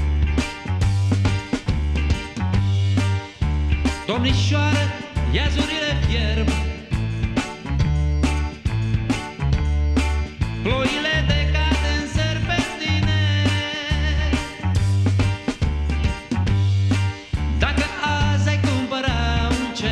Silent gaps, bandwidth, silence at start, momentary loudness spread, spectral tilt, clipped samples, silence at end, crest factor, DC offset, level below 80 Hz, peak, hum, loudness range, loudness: none; 10.5 kHz; 0 s; 5 LU; -5.5 dB/octave; under 0.1%; 0 s; 16 dB; under 0.1%; -26 dBFS; -4 dBFS; none; 2 LU; -21 LUFS